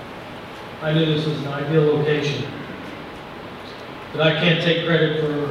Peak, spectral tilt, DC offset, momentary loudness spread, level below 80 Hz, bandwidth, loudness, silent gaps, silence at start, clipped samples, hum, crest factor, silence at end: -4 dBFS; -6.5 dB/octave; under 0.1%; 17 LU; -54 dBFS; 10.5 kHz; -20 LUFS; none; 0 s; under 0.1%; none; 18 dB; 0 s